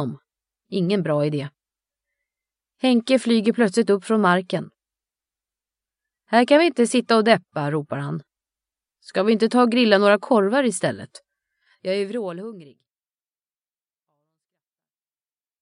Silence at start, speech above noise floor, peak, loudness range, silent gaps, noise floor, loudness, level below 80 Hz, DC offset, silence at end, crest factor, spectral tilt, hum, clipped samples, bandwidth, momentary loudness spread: 0 s; over 70 dB; -2 dBFS; 12 LU; none; under -90 dBFS; -20 LUFS; -78 dBFS; under 0.1%; 3 s; 20 dB; -5.5 dB/octave; none; under 0.1%; 11 kHz; 15 LU